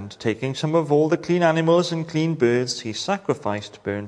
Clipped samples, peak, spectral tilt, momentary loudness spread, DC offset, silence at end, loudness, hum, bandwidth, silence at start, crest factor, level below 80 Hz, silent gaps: under 0.1%; -4 dBFS; -6 dB/octave; 8 LU; under 0.1%; 0 s; -22 LUFS; none; 10.5 kHz; 0 s; 18 dB; -64 dBFS; none